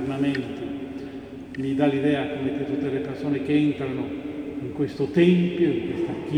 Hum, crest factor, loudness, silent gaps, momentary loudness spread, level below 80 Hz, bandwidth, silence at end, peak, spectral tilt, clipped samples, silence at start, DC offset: none; 18 dB; -25 LUFS; none; 13 LU; -56 dBFS; 10 kHz; 0 s; -6 dBFS; -8 dB/octave; under 0.1%; 0 s; under 0.1%